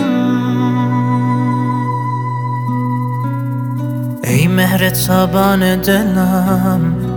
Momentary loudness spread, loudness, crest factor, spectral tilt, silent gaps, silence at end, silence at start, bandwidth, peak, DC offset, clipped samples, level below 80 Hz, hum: 7 LU; -15 LUFS; 14 dB; -6 dB/octave; none; 0 s; 0 s; over 20 kHz; 0 dBFS; under 0.1%; under 0.1%; -38 dBFS; none